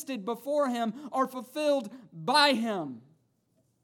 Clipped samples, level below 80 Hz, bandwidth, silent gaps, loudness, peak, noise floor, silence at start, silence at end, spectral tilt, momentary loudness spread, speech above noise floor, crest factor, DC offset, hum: under 0.1%; under -90 dBFS; 18.5 kHz; none; -28 LUFS; -10 dBFS; -72 dBFS; 0 s; 0.85 s; -3.5 dB/octave; 15 LU; 43 dB; 20 dB; under 0.1%; none